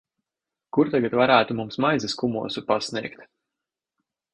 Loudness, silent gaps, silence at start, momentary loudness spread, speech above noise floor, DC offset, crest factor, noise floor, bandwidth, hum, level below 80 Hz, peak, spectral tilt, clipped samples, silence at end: -23 LUFS; none; 0.75 s; 11 LU; 65 dB; under 0.1%; 22 dB; -88 dBFS; 10.5 kHz; none; -64 dBFS; -2 dBFS; -5 dB/octave; under 0.1%; 1.1 s